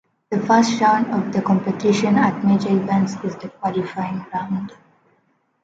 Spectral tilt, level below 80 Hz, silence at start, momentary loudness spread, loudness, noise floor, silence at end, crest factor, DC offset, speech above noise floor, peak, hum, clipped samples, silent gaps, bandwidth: -6.5 dB/octave; -62 dBFS; 0.3 s; 11 LU; -20 LUFS; -64 dBFS; 0.95 s; 18 dB; under 0.1%; 45 dB; -2 dBFS; none; under 0.1%; none; 7.8 kHz